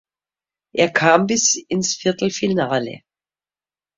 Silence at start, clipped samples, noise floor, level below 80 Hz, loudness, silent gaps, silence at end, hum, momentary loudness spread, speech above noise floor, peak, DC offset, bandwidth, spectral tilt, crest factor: 0.75 s; under 0.1%; under -90 dBFS; -60 dBFS; -18 LUFS; none; 1 s; none; 8 LU; over 72 dB; 0 dBFS; under 0.1%; 7.8 kHz; -3 dB/octave; 20 dB